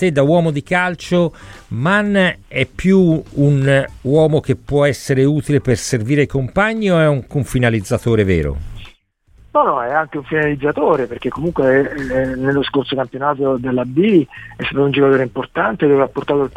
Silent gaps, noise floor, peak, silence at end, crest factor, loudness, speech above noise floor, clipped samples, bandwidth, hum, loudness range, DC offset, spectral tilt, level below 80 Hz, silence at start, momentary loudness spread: none; -51 dBFS; -2 dBFS; 0 s; 14 dB; -16 LUFS; 35 dB; under 0.1%; 15 kHz; none; 3 LU; under 0.1%; -6.5 dB/octave; -38 dBFS; 0 s; 7 LU